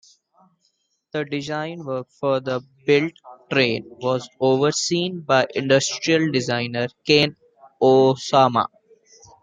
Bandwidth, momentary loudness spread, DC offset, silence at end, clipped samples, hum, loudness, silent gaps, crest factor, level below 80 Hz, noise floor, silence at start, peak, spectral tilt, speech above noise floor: 9.6 kHz; 11 LU; under 0.1%; 0.75 s; under 0.1%; none; -21 LUFS; none; 20 dB; -64 dBFS; -69 dBFS; 1.15 s; 0 dBFS; -4.5 dB/octave; 49 dB